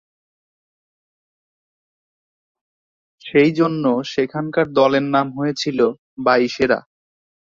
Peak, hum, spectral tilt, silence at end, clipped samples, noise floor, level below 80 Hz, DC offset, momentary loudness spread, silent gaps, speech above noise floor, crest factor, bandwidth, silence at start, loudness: -2 dBFS; none; -6 dB/octave; 0.8 s; under 0.1%; under -90 dBFS; -60 dBFS; under 0.1%; 7 LU; 5.98-6.17 s; over 73 dB; 20 dB; 7.6 kHz; 3.25 s; -18 LUFS